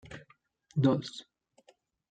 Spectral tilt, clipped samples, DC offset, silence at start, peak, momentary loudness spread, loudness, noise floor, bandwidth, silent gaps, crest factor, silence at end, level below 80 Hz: -7.5 dB/octave; under 0.1%; under 0.1%; 0.1 s; -14 dBFS; 22 LU; -31 LUFS; -67 dBFS; 9.2 kHz; none; 22 dB; 0.9 s; -68 dBFS